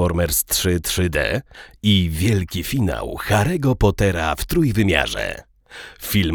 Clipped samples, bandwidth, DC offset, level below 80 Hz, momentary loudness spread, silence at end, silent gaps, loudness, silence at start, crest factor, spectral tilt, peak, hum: under 0.1%; over 20 kHz; under 0.1%; -32 dBFS; 9 LU; 0 s; none; -20 LUFS; 0 s; 20 dB; -4.5 dB/octave; 0 dBFS; none